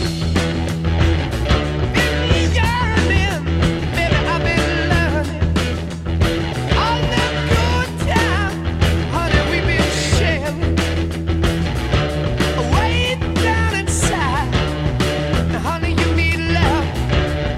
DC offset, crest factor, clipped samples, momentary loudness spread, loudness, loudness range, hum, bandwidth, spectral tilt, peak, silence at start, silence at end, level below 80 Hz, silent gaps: under 0.1%; 14 dB; under 0.1%; 4 LU; -18 LUFS; 1 LU; none; 14 kHz; -5.5 dB/octave; -2 dBFS; 0 s; 0 s; -24 dBFS; none